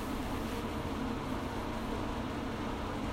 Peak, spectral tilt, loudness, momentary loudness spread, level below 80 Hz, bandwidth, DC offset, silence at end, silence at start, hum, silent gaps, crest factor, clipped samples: -24 dBFS; -6 dB/octave; -37 LUFS; 1 LU; -44 dBFS; 16 kHz; under 0.1%; 0 s; 0 s; none; none; 14 dB; under 0.1%